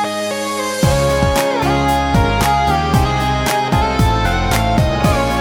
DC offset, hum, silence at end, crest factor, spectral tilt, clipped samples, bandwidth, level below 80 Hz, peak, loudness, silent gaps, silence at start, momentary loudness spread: under 0.1%; none; 0 s; 14 dB; -5 dB/octave; under 0.1%; over 20 kHz; -24 dBFS; -2 dBFS; -15 LUFS; none; 0 s; 2 LU